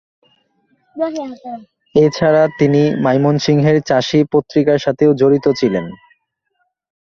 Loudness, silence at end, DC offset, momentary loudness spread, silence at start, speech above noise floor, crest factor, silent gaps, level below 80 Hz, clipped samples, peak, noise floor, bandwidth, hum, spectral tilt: -14 LUFS; 1.25 s; under 0.1%; 13 LU; 0.95 s; 54 dB; 14 dB; none; -52 dBFS; under 0.1%; -2 dBFS; -68 dBFS; 7.2 kHz; none; -7 dB/octave